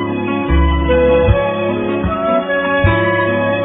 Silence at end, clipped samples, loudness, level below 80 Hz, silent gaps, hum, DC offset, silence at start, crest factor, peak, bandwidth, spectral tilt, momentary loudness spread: 0 s; under 0.1%; -14 LUFS; -22 dBFS; none; none; under 0.1%; 0 s; 14 dB; 0 dBFS; 4 kHz; -11.5 dB/octave; 6 LU